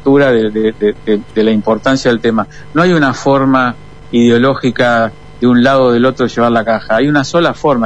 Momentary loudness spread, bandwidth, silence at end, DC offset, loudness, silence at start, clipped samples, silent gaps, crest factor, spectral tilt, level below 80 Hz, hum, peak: 7 LU; 9.2 kHz; 0 s; 2%; -12 LUFS; 0.05 s; under 0.1%; none; 10 dB; -6 dB/octave; -40 dBFS; none; 0 dBFS